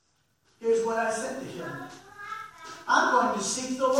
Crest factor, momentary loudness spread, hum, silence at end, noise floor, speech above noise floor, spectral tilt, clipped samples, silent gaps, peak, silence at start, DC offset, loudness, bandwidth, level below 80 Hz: 20 dB; 18 LU; none; 0 s; -70 dBFS; 43 dB; -2.5 dB/octave; under 0.1%; none; -8 dBFS; 0.6 s; under 0.1%; -27 LUFS; 16 kHz; -72 dBFS